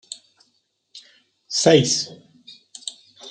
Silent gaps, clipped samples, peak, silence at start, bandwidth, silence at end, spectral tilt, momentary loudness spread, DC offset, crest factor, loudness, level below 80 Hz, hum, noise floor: none; under 0.1%; -2 dBFS; 0.95 s; 9.6 kHz; 0 s; -3.5 dB/octave; 24 LU; under 0.1%; 22 dB; -18 LUFS; -68 dBFS; none; -68 dBFS